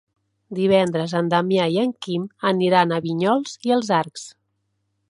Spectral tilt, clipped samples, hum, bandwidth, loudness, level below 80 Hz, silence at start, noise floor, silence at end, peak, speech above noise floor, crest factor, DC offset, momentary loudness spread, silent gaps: -6 dB/octave; under 0.1%; none; 11.5 kHz; -20 LUFS; -66 dBFS; 0.5 s; -72 dBFS; 0.8 s; -2 dBFS; 52 dB; 20 dB; under 0.1%; 10 LU; none